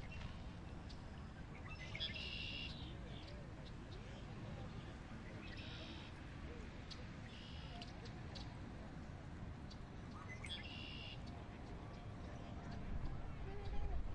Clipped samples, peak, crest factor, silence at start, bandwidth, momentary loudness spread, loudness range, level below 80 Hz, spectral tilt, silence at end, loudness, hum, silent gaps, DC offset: under 0.1%; -30 dBFS; 18 dB; 0 s; 10.5 kHz; 7 LU; 4 LU; -54 dBFS; -5.5 dB/octave; 0 s; -51 LUFS; none; none; under 0.1%